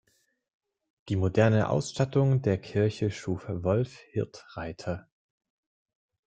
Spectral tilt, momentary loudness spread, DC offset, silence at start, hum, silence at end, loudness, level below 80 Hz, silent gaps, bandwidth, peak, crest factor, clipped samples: -7 dB/octave; 13 LU; under 0.1%; 1.05 s; none; 1.25 s; -28 LUFS; -58 dBFS; none; 9.2 kHz; -8 dBFS; 20 dB; under 0.1%